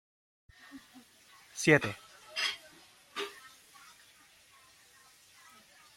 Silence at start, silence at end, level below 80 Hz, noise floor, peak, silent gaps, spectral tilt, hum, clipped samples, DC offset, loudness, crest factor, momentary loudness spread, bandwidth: 0.75 s; 2.5 s; -72 dBFS; -61 dBFS; -8 dBFS; none; -4 dB/octave; none; under 0.1%; under 0.1%; -32 LUFS; 30 dB; 29 LU; 16.5 kHz